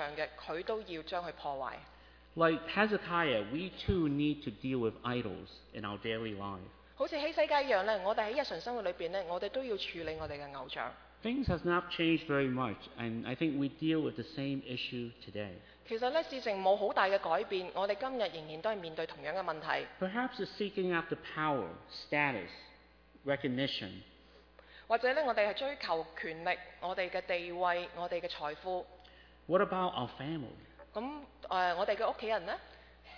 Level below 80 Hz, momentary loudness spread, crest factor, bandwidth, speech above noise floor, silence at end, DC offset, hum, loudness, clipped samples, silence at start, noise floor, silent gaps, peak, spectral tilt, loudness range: -60 dBFS; 12 LU; 22 dB; 5.4 kHz; 26 dB; 0 s; under 0.1%; none; -36 LUFS; under 0.1%; 0 s; -62 dBFS; none; -14 dBFS; -6.5 dB/octave; 4 LU